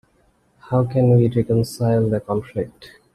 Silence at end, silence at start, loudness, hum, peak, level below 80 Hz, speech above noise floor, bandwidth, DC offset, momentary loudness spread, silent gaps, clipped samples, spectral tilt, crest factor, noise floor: 0.3 s; 0.7 s; -19 LUFS; none; -4 dBFS; -48 dBFS; 42 dB; 13 kHz; under 0.1%; 12 LU; none; under 0.1%; -8.5 dB/octave; 14 dB; -60 dBFS